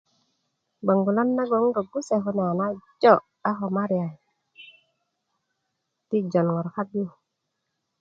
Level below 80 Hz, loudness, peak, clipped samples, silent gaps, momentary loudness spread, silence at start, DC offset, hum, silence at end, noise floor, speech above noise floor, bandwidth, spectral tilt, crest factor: -72 dBFS; -24 LUFS; -2 dBFS; under 0.1%; none; 10 LU; 0.85 s; under 0.1%; none; 0.9 s; -80 dBFS; 56 dB; 7.8 kHz; -7.5 dB/octave; 24 dB